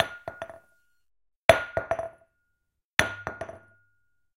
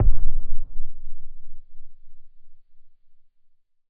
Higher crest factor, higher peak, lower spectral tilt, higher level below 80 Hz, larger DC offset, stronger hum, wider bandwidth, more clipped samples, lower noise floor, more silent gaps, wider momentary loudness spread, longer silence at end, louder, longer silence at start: first, 30 dB vs 14 dB; first, 0 dBFS vs -4 dBFS; second, -3.5 dB/octave vs -12.5 dB/octave; second, -54 dBFS vs -26 dBFS; neither; neither; first, 16 kHz vs 0.5 kHz; neither; first, -79 dBFS vs -55 dBFS; first, 1.36-1.49 s, 2.85-2.97 s vs none; second, 20 LU vs 25 LU; second, 0.8 s vs 1.1 s; first, -26 LUFS vs -34 LUFS; about the same, 0 s vs 0 s